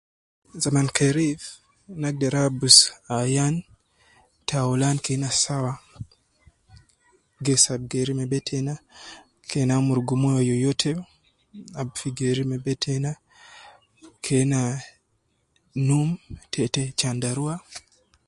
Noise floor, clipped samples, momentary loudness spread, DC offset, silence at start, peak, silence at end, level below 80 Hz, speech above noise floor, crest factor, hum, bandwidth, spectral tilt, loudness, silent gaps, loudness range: -70 dBFS; under 0.1%; 17 LU; under 0.1%; 0.55 s; 0 dBFS; 0.5 s; -56 dBFS; 47 dB; 24 dB; none; 11.5 kHz; -4 dB/octave; -23 LUFS; none; 8 LU